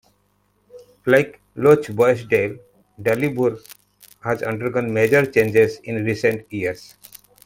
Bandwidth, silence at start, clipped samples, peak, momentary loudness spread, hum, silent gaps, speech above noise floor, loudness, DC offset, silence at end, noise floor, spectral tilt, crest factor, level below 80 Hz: 17 kHz; 0.75 s; under 0.1%; -2 dBFS; 12 LU; 50 Hz at -50 dBFS; none; 45 dB; -19 LUFS; under 0.1%; 0.6 s; -64 dBFS; -6.5 dB/octave; 18 dB; -58 dBFS